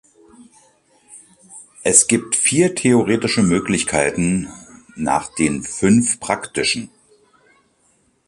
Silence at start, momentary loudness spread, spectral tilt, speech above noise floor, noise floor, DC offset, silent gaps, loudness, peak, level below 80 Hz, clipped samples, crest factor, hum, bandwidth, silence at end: 0.4 s; 11 LU; -3.5 dB/octave; 43 dB; -61 dBFS; under 0.1%; none; -17 LUFS; 0 dBFS; -48 dBFS; under 0.1%; 20 dB; none; 12 kHz; 1.4 s